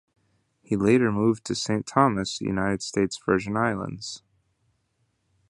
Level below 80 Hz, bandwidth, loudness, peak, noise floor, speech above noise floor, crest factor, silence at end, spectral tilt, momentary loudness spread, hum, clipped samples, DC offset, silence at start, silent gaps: -54 dBFS; 11 kHz; -25 LUFS; -4 dBFS; -72 dBFS; 48 dB; 22 dB; 1.3 s; -5.5 dB/octave; 12 LU; none; under 0.1%; under 0.1%; 0.7 s; none